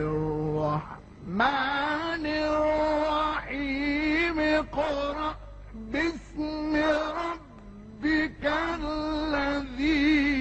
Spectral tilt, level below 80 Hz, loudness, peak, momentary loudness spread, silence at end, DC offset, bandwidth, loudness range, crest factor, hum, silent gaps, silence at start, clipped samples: -6 dB/octave; -44 dBFS; -27 LUFS; -12 dBFS; 10 LU; 0 s; under 0.1%; 8.4 kHz; 3 LU; 16 dB; none; none; 0 s; under 0.1%